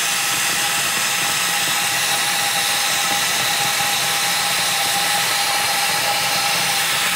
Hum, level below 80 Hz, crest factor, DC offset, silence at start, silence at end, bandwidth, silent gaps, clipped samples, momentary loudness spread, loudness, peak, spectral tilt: none; -58 dBFS; 14 dB; under 0.1%; 0 s; 0 s; 16 kHz; none; under 0.1%; 1 LU; -16 LUFS; -6 dBFS; 0.5 dB/octave